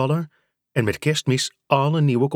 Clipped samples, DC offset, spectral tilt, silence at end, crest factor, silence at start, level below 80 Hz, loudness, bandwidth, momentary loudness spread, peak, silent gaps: under 0.1%; under 0.1%; -5.5 dB/octave; 0 s; 18 dB; 0 s; -58 dBFS; -22 LUFS; 15.5 kHz; 7 LU; -4 dBFS; none